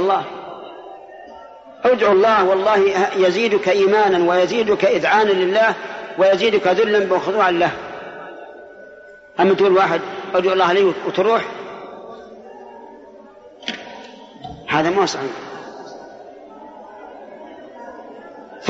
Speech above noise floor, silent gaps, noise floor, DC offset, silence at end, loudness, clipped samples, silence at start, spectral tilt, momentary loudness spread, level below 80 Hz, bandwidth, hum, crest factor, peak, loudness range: 27 dB; none; -42 dBFS; under 0.1%; 0 s; -16 LUFS; under 0.1%; 0 s; -2.5 dB/octave; 24 LU; -60 dBFS; 7.8 kHz; none; 16 dB; -4 dBFS; 11 LU